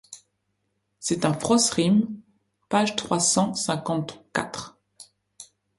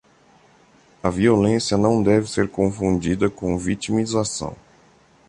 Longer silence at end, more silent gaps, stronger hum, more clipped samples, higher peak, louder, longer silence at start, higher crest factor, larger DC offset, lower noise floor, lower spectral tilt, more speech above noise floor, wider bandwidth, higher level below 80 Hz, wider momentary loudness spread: second, 0.35 s vs 0.75 s; neither; neither; neither; about the same, -4 dBFS vs -4 dBFS; second, -24 LUFS vs -21 LUFS; second, 0.1 s vs 1.05 s; about the same, 22 dB vs 18 dB; neither; first, -75 dBFS vs -54 dBFS; second, -4 dB/octave vs -5.5 dB/octave; first, 52 dB vs 35 dB; about the same, 11.5 kHz vs 11 kHz; second, -62 dBFS vs -44 dBFS; first, 15 LU vs 9 LU